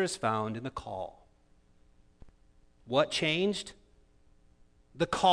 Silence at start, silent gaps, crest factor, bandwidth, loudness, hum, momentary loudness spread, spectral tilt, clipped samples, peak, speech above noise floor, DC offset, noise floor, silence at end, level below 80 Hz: 0 s; none; 22 dB; 11 kHz; -32 LUFS; none; 13 LU; -4 dB/octave; under 0.1%; -12 dBFS; 33 dB; under 0.1%; -64 dBFS; 0 s; -60 dBFS